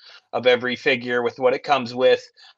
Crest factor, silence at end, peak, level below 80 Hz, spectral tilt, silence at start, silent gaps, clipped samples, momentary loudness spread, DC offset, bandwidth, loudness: 18 dB; 0.3 s; -4 dBFS; -72 dBFS; -4.5 dB/octave; 0.15 s; none; under 0.1%; 4 LU; under 0.1%; 7.4 kHz; -20 LUFS